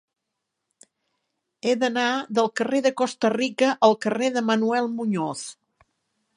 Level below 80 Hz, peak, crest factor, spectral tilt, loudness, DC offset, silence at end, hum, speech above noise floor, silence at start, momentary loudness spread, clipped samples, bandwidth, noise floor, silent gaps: -76 dBFS; -4 dBFS; 22 dB; -4.5 dB/octave; -23 LUFS; under 0.1%; 0.85 s; none; 59 dB; 1.65 s; 8 LU; under 0.1%; 11 kHz; -81 dBFS; none